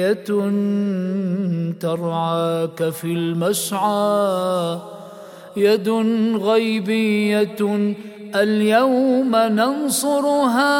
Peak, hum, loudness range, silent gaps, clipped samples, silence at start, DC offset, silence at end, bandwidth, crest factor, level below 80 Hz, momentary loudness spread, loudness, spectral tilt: -4 dBFS; none; 3 LU; none; under 0.1%; 0 s; under 0.1%; 0 s; 17 kHz; 14 dB; -70 dBFS; 7 LU; -19 LUFS; -5 dB/octave